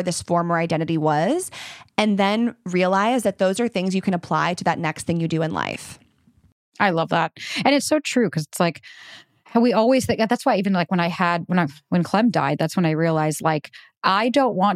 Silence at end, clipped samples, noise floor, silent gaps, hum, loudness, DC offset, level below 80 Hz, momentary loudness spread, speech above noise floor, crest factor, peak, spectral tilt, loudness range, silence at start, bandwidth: 0 s; under 0.1%; -58 dBFS; 6.52-6.72 s, 13.97-14.01 s; none; -21 LUFS; under 0.1%; -64 dBFS; 6 LU; 37 dB; 18 dB; -4 dBFS; -5.5 dB/octave; 3 LU; 0 s; 15 kHz